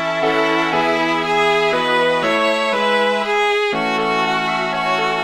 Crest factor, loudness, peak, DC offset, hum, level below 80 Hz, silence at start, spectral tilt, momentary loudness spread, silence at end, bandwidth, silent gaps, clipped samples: 14 dB; -16 LUFS; -4 dBFS; 0.2%; none; -56 dBFS; 0 s; -4 dB/octave; 2 LU; 0 s; 15.5 kHz; none; under 0.1%